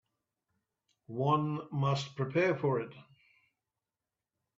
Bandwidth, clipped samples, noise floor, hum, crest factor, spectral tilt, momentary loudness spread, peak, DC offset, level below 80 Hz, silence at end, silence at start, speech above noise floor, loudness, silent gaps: 7.8 kHz; under 0.1%; under -90 dBFS; none; 20 dB; -7 dB/octave; 7 LU; -16 dBFS; under 0.1%; -74 dBFS; 1.55 s; 1.1 s; over 58 dB; -32 LUFS; none